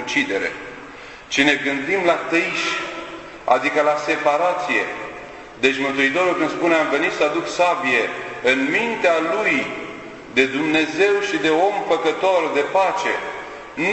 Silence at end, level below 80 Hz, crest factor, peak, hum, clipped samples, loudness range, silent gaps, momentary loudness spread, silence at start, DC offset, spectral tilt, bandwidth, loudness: 0 s; -58 dBFS; 20 dB; 0 dBFS; none; under 0.1%; 2 LU; none; 14 LU; 0 s; under 0.1%; -3.5 dB/octave; 9.4 kHz; -19 LUFS